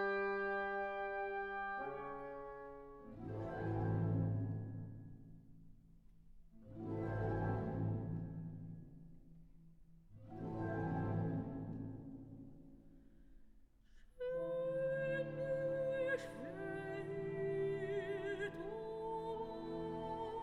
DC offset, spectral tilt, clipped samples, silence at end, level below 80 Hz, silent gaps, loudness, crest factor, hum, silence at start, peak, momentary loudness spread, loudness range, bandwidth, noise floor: under 0.1%; -8.5 dB/octave; under 0.1%; 0 s; -62 dBFS; none; -42 LUFS; 14 dB; none; 0 s; -28 dBFS; 17 LU; 6 LU; 9.4 kHz; -64 dBFS